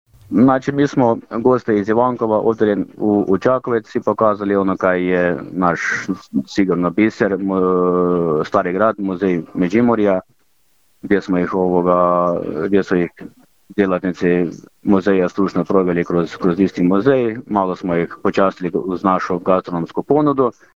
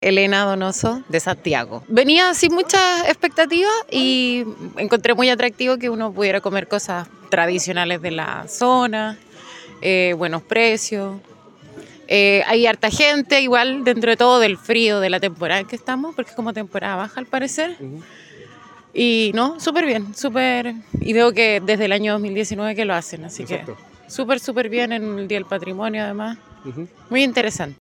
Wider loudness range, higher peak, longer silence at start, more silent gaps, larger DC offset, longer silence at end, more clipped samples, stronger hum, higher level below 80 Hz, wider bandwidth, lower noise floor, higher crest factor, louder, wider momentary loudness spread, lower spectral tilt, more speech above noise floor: second, 2 LU vs 8 LU; about the same, -2 dBFS vs 0 dBFS; first, 0.3 s vs 0 s; neither; neither; first, 0.25 s vs 0.05 s; neither; neither; first, -50 dBFS vs -56 dBFS; second, 7.6 kHz vs 17 kHz; first, -62 dBFS vs -44 dBFS; about the same, 14 dB vs 18 dB; about the same, -17 LUFS vs -18 LUFS; second, 5 LU vs 14 LU; first, -8 dB/octave vs -3.5 dB/octave; first, 46 dB vs 26 dB